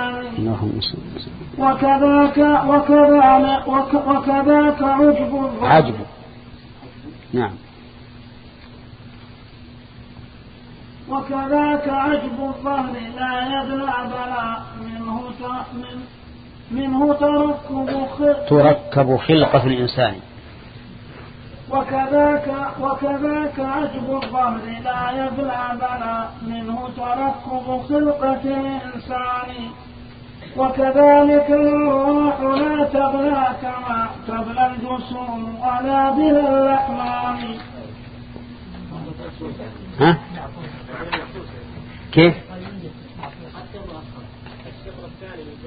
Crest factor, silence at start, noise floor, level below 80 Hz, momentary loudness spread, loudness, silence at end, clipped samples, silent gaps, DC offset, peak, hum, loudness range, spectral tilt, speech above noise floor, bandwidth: 20 dB; 0 s; -41 dBFS; -44 dBFS; 23 LU; -18 LUFS; 0 s; under 0.1%; none; under 0.1%; 0 dBFS; none; 11 LU; -11.5 dB/octave; 23 dB; 5 kHz